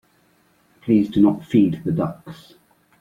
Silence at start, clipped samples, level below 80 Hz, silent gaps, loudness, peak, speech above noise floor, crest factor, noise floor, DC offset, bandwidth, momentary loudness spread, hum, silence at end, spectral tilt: 0.85 s; under 0.1%; -56 dBFS; none; -19 LUFS; -4 dBFS; 41 dB; 18 dB; -60 dBFS; under 0.1%; 7.2 kHz; 19 LU; none; 0.65 s; -9 dB/octave